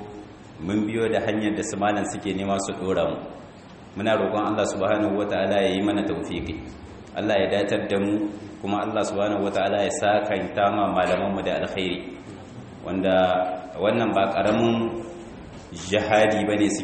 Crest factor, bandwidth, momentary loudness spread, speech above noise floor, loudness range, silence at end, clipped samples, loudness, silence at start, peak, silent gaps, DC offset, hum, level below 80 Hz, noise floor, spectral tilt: 20 dB; 8.8 kHz; 18 LU; 21 dB; 2 LU; 0 s; under 0.1%; -24 LUFS; 0 s; -4 dBFS; none; under 0.1%; none; -52 dBFS; -44 dBFS; -5 dB/octave